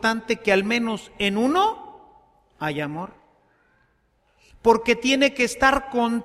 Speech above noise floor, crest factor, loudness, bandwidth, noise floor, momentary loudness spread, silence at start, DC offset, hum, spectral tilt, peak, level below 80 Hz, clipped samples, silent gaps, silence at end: 44 dB; 20 dB; -21 LUFS; 15 kHz; -65 dBFS; 12 LU; 0 s; under 0.1%; none; -4 dB/octave; -4 dBFS; -50 dBFS; under 0.1%; none; 0 s